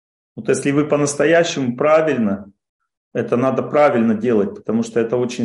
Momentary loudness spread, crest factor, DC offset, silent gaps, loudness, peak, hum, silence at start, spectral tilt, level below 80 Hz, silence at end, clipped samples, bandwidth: 7 LU; 16 dB; under 0.1%; 2.69-2.79 s, 2.97-3.11 s; -17 LUFS; -2 dBFS; none; 0.35 s; -5.5 dB/octave; -62 dBFS; 0 s; under 0.1%; 11.5 kHz